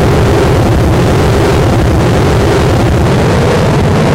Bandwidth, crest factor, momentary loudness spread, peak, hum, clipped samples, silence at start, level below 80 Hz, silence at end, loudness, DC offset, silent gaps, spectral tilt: 16 kHz; 6 dB; 1 LU; -2 dBFS; none; under 0.1%; 0 s; -18 dBFS; 0 s; -9 LUFS; under 0.1%; none; -6.5 dB/octave